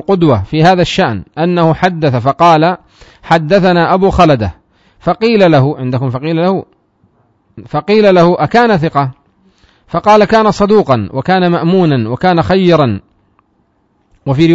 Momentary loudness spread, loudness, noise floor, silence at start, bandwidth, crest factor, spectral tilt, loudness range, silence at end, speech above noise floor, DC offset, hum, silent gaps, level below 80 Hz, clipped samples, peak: 9 LU; -10 LUFS; -57 dBFS; 0.1 s; 7.8 kHz; 10 dB; -7 dB/octave; 2 LU; 0 s; 47 dB; under 0.1%; none; none; -36 dBFS; 0.5%; 0 dBFS